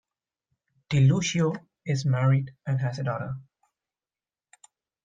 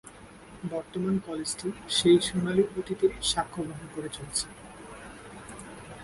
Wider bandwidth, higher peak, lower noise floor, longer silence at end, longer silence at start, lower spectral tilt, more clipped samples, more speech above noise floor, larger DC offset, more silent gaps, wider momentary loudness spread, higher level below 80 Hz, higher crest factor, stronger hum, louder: second, 7.8 kHz vs 11.5 kHz; about the same, -10 dBFS vs -10 dBFS; first, under -90 dBFS vs -49 dBFS; first, 1.6 s vs 0 s; first, 0.9 s vs 0.05 s; first, -6 dB/octave vs -4 dB/octave; neither; first, over 66 dB vs 21 dB; neither; neither; second, 13 LU vs 22 LU; second, -60 dBFS vs -54 dBFS; about the same, 16 dB vs 20 dB; neither; about the same, -26 LUFS vs -28 LUFS